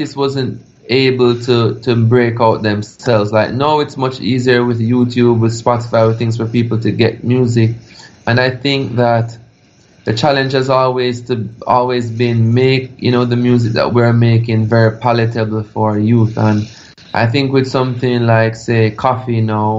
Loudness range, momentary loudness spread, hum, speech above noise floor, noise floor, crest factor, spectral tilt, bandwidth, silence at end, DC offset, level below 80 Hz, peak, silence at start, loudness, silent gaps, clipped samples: 3 LU; 6 LU; none; 35 dB; -48 dBFS; 14 dB; -7 dB/octave; 7.8 kHz; 0 s; under 0.1%; -48 dBFS; 0 dBFS; 0 s; -13 LUFS; none; under 0.1%